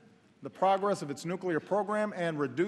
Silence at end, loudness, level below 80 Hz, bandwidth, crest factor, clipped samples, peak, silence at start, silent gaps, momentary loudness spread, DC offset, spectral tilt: 0 s; -31 LUFS; -82 dBFS; 12.5 kHz; 16 dB; under 0.1%; -16 dBFS; 0.4 s; none; 9 LU; under 0.1%; -6 dB/octave